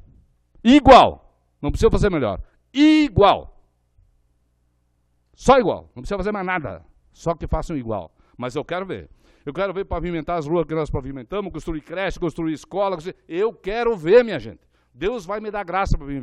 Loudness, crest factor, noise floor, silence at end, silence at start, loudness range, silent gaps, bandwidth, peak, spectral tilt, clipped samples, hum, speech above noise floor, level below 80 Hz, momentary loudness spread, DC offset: -20 LUFS; 20 dB; -66 dBFS; 0 s; 0.65 s; 11 LU; none; 10.5 kHz; 0 dBFS; -6.5 dB/octave; under 0.1%; 60 Hz at -55 dBFS; 46 dB; -34 dBFS; 16 LU; under 0.1%